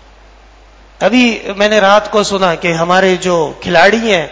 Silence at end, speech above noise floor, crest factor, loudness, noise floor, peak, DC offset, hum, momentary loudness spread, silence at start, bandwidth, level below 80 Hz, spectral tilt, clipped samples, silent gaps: 0 s; 30 dB; 12 dB; -11 LUFS; -40 dBFS; 0 dBFS; under 0.1%; none; 6 LU; 1 s; 8 kHz; -42 dBFS; -4 dB/octave; 0.5%; none